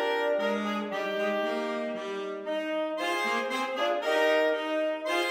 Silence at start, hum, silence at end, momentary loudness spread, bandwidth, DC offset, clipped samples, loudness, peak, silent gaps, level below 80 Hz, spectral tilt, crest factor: 0 s; none; 0 s; 8 LU; 16.5 kHz; under 0.1%; under 0.1%; -29 LUFS; -12 dBFS; none; -84 dBFS; -3.5 dB/octave; 16 dB